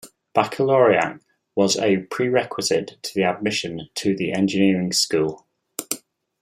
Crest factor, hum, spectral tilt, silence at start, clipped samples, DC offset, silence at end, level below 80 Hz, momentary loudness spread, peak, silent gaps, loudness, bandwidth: 18 dB; none; -4 dB/octave; 0.05 s; under 0.1%; under 0.1%; 0.45 s; -62 dBFS; 11 LU; -2 dBFS; none; -21 LUFS; 16.5 kHz